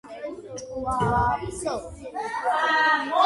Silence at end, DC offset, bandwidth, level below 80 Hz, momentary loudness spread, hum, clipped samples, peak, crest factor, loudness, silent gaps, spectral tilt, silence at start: 0 s; under 0.1%; 11.5 kHz; -44 dBFS; 16 LU; none; under 0.1%; -8 dBFS; 18 dB; -24 LUFS; none; -4.5 dB/octave; 0.05 s